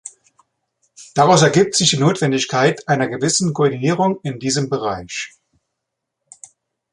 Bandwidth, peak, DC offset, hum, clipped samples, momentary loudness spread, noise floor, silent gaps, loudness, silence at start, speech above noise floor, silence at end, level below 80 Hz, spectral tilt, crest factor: 11.5 kHz; -2 dBFS; under 0.1%; none; under 0.1%; 13 LU; -79 dBFS; none; -17 LUFS; 0.05 s; 62 dB; 1.65 s; -56 dBFS; -4 dB/octave; 18 dB